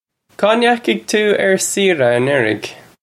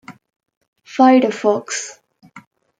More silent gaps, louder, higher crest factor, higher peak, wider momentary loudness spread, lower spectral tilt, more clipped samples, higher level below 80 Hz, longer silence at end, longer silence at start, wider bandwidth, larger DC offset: second, none vs 0.57-0.61 s, 0.68-0.73 s; about the same, -15 LUFS vs -15 LUFS; about the same, 14 dB vs 16 dB; about the same, 0 dBFS vs -2 dBFS; second, 5 LU vs 17 LU; about the same, -3.5 dB/octave vs -4 dB/octave; neither; first, -62 dBFS vs -74 dBFS; second, 0.25 s vs 0.4 s; first, 0.4 s vs 0.1 s; first, 15.5 kHz vs 9.2 kHz; neither